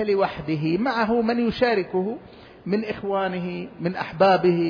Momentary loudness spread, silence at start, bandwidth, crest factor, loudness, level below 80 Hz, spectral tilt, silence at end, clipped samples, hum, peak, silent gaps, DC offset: 11 LU; 0 s; 5.2 kHz; 16 dB; -23 LUFS; -54 dBFS; -8 dB/octave; 0 s; under 0.1%; none; -6 dBFS; none; under 0.1%